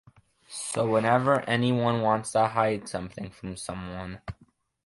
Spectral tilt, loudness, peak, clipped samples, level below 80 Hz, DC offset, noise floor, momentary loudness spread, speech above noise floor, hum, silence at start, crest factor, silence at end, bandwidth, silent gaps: -5.5 dB/octave; -26 LUFS; -8 dBFS; under 0.1%; -56 dBFS; under 0.1%; -53 dBFS; 16 LU; 27 dB; none; 0.5 s; 20 dB; 0.55 s; 11.5 kHz; none